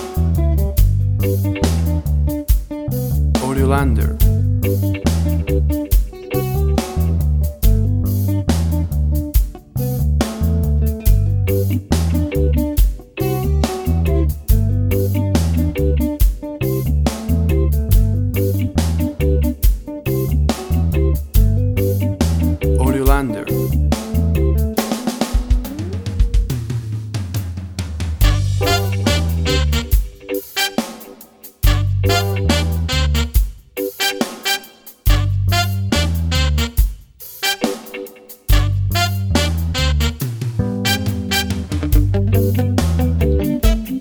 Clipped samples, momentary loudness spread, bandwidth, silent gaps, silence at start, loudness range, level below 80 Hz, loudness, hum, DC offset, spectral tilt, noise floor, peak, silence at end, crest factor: under 0.1%; 7 LU; over 20 kHz; none; 0 s; 2 LU; -20 dBFS; -18 LUFS; none; under 0.1%; -6 dB/octave; -41 dBFS; 0 dBFS; 0 s; 16 dB